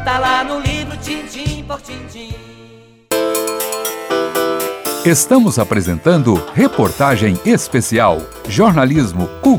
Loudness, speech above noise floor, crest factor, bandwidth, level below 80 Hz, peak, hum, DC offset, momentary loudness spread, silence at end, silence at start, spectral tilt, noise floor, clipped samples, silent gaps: -15 LUFS; 28 dB; 14 dB; over 20 kHz; -36 dBFS; 0 dBFS; none; under 0.1%; 13 LU; 0 s; 0 s; -5 dB/octave; -42 dBFS; under 0.1%; none